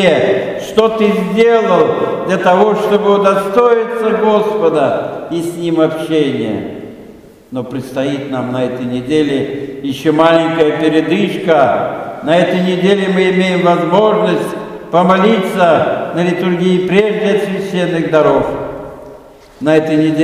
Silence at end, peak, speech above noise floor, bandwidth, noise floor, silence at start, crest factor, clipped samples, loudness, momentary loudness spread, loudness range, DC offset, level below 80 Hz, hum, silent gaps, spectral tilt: 0 s; 0 dBFS; 25 dB; 15 kHz; -37 dBFS; 0 s; 12 dB; under 0.1%; -13 LUFS; 11 LU; 6 LU; under 0.1%; -48 dBFS; none; none; -6.5 dB/octave